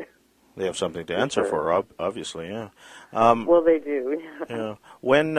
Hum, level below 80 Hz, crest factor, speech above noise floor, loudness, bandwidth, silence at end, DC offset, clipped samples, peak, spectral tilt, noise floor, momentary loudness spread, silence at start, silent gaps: none; -58 dBFS; 22 dB; 36 dB; -24 LUFS; 12 kHz; 0 s; under 0.1%; under 0.1%; -2 dBFS; -5 dB/octave; -59 dBFS; 15 LU; 0 s; none